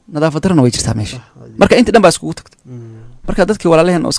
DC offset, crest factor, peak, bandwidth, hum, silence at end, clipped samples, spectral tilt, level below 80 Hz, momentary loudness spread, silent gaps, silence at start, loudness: under 0.1%; 12 dB; 0 dBFS; 11 kHz; none; 0 s; 0.4%; -5.5 dB/octave; -32 dBFS; 22 LU; none; 0.1 s; -12 LUFS